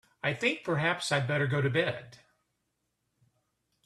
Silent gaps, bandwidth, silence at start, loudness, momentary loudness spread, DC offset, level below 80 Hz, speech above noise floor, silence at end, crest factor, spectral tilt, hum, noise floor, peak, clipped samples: none; 12.5 kHz; 0.25 s; -29 LUFS; 6 LU; under 0.1%; -68 dBFS; 51 dB; 1.7 s; 20 dB; -5 dB/octave; none; -81 dBFS; -12 dBFS; under 0.1%